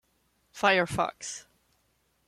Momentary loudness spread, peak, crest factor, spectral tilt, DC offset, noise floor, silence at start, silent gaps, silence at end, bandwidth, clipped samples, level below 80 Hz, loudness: 15 LU; -10 dBFS; 22 dB; -3.5 dB/octave; under 0.1%; -72 dBFS; 0.55 s; none; 0.85 s; 15 kHz; under 0.1%; -60 dBFS; -27 LUFS